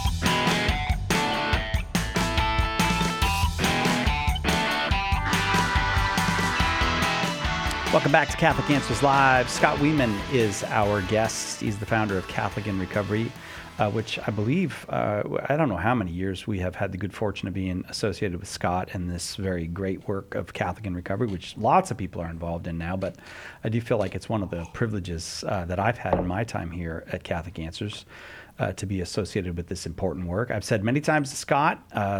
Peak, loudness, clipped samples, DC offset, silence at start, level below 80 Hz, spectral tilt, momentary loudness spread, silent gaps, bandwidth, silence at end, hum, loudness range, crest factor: -4 dBFS; -26 LUFS; under 0.1%; under 0.1%; 0 s; -36 dBFS; -5 dB/octave; 10 LU; none; 19 kHz; 0 s; none; 8 LU; 22 dB